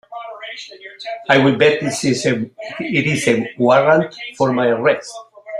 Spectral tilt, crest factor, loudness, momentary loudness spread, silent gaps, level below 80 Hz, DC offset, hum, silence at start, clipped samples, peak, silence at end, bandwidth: -5 dB/octave; 16 dB; -16 LUFS; 19 LU; none; -56 dBFS; under 0.1%; none; 0.1 s; under 0.1%; 0 dBFS; 0 s; 13.5 kHz